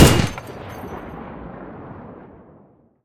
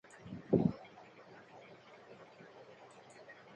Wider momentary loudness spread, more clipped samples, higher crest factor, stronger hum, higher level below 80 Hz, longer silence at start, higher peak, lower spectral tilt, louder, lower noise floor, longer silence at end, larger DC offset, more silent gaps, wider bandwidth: second, 19 LU vs 24 LU; neither; about the same, 22 dB vs 26 dB; neither; first, -34 dBFS vs -70 dBFS; second, 0 s vs 0.25 s; first, 0 dBFS vs -16 dBFS; second, -5 dB/octave vs -8.5 dB/octave; first, -24 LUFS vs -36 LUFS; second, -52 dBFS vs -58 dBFS; first, 1.1 s vs 0.25 s; neither; neither; first, 18 kHz vs 9 kHz